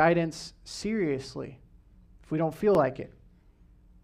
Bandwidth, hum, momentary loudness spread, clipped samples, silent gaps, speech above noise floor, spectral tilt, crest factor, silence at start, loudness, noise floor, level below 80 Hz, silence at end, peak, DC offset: 14.5 kHz; none; 18 LU; under 0.1%; none; 30 dB; -6 dB/octave; 20 dB; 0 s; -29 LUFS; -58 dBFS; -56 dBFS; 0.95 s; -10 dBFS; under 0.1%